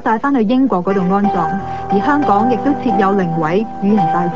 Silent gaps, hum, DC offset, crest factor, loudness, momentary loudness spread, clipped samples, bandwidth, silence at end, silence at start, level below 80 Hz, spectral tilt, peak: none; none; 2%; 12 dB; -15 LUFS; 4 LU; under 0.1%; 7.4 kHz; 0 s; 0 s; -44 dBFS; -8.5 dB/octave; -2 dBFS